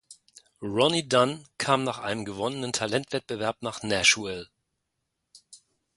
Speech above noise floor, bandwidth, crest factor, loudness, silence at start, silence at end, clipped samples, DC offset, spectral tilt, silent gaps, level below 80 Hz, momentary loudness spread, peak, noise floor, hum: 54 dB; 11.5 kHz; 22 dB; -26 LUFS; 0.1 s; 0.4 s; under 0.1%; under 0.1%; -3 dB/octave; none; -62 dBFS; 11 LU; -6 dBFS; -81 dBFS; none